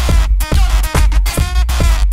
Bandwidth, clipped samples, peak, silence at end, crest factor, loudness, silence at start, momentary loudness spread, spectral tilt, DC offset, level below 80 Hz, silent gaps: 16 kHz; under 0.1%; 0 dBFS; 0 s; 10 dB; -15 LUFS; 0 s; 2 LU; -4.5 dB/octave; under 0.1%; -12 dBFS; none